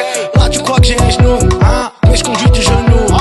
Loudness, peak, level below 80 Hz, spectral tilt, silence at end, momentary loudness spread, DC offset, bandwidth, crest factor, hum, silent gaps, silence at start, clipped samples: -10 LUFS; 0 dBFS; -14 dBFS; -5 dB/octave; 0 s; 2 LU; under 0.1%; 12.5 kHz; 10 dB; none; none; 0 s; under 0.1%